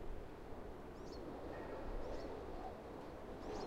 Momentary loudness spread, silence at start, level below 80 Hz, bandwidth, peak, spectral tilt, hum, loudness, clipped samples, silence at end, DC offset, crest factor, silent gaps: 5 LU; 0 s; -54 dBFS; 16 kHz; -34 dBFS; -6.5 dB/octave; none; -50 LUFS; under 0.1%; 0 s; under 0.1%; 14 dB; none